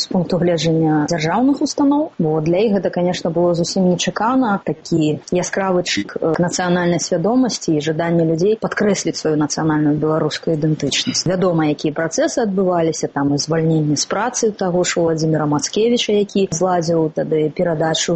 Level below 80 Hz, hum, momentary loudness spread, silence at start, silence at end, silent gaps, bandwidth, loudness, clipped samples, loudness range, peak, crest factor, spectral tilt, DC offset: -52 dBFS; none; 3 LU; 0 s; 0 s; none; 8.6 kHz; -17 LUFS; under 0.1%; 1 LU; -6 dBFS; 10 dB; -5 dB/octave; under 0.1%